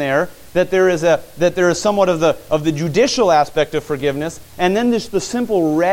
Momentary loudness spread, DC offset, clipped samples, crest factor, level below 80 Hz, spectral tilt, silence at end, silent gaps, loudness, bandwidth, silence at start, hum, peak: 6 LU; under 0.1%; under 0.1%; 14 dB; -46 dBFS; -5 dB/octave; 0 s; none; -17 LUFS; 17 kHz; 0 s; none; -2 dBFS